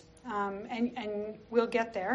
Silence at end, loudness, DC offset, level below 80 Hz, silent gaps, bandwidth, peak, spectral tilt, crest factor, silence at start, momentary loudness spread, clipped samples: 0 s; -34 LUFS; under 0.1%; -66 dBFS; none; 8 kHz; -14 dBFS; -3.5 dB/octave; 20 dB; 0.05 s; 8 LU; under 0.1%